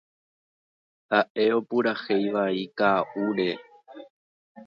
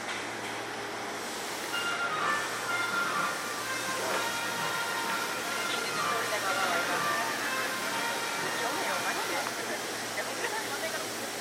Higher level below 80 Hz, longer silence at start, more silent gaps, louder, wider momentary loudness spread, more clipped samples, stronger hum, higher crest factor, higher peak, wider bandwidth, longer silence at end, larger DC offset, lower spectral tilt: about the same, -74 dBFS vs -72 dBFS; first, 1.1 s vs 0 s; first, 1.30-1.35 s, 4.10-4.55 s vs none; first, -25 LUFS vs -31 LUFS; about the same, 5 LU vs 6 LU; neither; neither; about the same, 20 dB vs 16 dB; first, -6 dBFS vs -16 dBFS; second, 6.6 kHz vs 16.5 kHz; about the same, 0.05 s vs 0 s; neither; first, -7.5 dB/octave vs -1.5 dB/octave